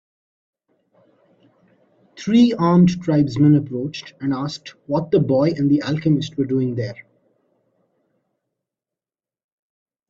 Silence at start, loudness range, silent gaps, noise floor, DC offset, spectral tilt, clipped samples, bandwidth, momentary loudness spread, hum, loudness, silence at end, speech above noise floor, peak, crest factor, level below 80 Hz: 2.15 s; 9 LU; none; under -90 dBFS; under 0.1%; -8 dB/octave; under 0.1%; 7.6 kHz; 14 LU; none; -19 LUFS; 3.1 s; over 72 dB; -4 dBFS; 16 dB; -56 dBFS